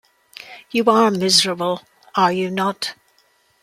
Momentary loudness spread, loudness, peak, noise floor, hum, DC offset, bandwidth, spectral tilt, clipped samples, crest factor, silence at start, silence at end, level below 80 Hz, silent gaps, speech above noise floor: 17 LU; -18 LUFS; -2 dBFS; -60 dBFS; none; under 0.1%; 15.5 kHz; -3.5 dB/octave; under 0.1%; 18 dB; 0.45 s; 0.7 s; -66 dBFS; none; 42 dB